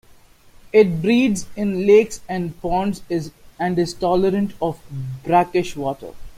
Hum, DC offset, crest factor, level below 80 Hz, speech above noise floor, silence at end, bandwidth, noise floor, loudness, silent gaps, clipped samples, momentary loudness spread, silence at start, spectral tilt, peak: none; under 0.1%; 18 dB; -44 dBFS; 30 dB; 0 s; 15.5 kHz; -49 dBFS; -20 LUFS; none; under 0.1%; 12 LU; 0.65 s; -6 dB/octave; -2 dBFS